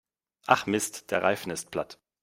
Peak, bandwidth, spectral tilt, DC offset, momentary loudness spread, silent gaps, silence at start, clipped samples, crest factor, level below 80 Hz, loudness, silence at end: -4 dBFS; 16 kHz; -3.5 dB/octave; under 0.1%; 12 LU; none; 0.45 s; under 0.1%; 26 dB; -66 dBFS; -28 LUFS; 0.3 s